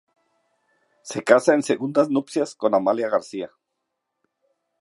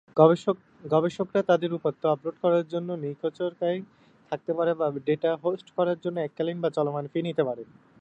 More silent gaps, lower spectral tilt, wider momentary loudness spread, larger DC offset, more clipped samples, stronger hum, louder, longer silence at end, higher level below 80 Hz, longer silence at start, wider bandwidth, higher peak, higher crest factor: neither; second, -5 dB/octave vs -8 dB/octave; first, 16 LU vs 8 LU; neither; neither; neither; first, -21 LUFS vs -27 LUFS; first, 1.35 s vs 0.35 s; about the same, -76 dBFS vs -74 dBFS; first, 1.05 s vs 0.15 s; first, 11.5 kHz vs 8.2 kHz; first, 0 dBFS vs -4 dBFS; about the same, 22 dB vs 22 dB